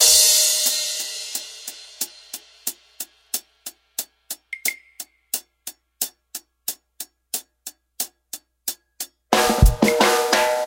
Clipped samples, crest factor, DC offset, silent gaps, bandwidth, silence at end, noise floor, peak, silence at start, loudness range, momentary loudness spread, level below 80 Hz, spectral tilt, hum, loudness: under 0.1%; 22 dB; under 0.1%; none; 17 kHz; 0 s; -43 dBFS; 0 dBFS; 0 s; 10 LU; 21 LU; -32 dBFS; -2 dB/octave; none; -21 LUFS